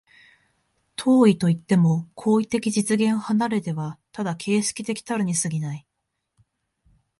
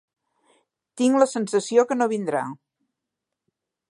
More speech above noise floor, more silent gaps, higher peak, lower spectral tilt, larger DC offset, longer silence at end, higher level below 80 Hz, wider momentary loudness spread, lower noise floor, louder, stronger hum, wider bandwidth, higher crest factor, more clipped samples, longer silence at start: second, 57 dB vs 63 dB; neither; about the same, -6 dBFS vs -4 dBFS; about the same, -5.5 dB/octave vs -4.5 dB/octave; neither; about the same, 1.4 s vs 1.35 s; first, -64 dBFS vs -80 dBFS; first, 13 LU vs 8 LU; second, -79 dBFS vs -84 dBFS; about the same, -23 LUFS vs -22 LUFS; neither; about the same, 11.5 kHz vs 11.5 kHz; about the same, 18 dB vs 20 dB; neither; about the same, 1 s vs 0.95 s